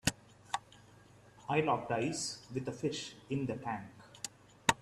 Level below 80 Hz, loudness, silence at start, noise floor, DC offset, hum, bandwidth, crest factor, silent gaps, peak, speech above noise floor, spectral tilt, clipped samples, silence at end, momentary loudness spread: -62 dBFS; -37 LUFS; 0.05 s; -60 dBFS; under 0.1%; none; 14.5 kHz; 30 dB; none; -8 dBFS; 24 dB; -4 dB/octave; under 0.1%; 0.05 s; 13 LU